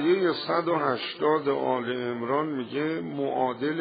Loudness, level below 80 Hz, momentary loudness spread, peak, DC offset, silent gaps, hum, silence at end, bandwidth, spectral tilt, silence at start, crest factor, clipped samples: -27 LUFS; -74 dBFS; 6 LU; -10 dBFS; under 0.1%; none; none; 0 s; 5 kHz; -4 dB/octave; 0 s; 16 dB; under 0.1%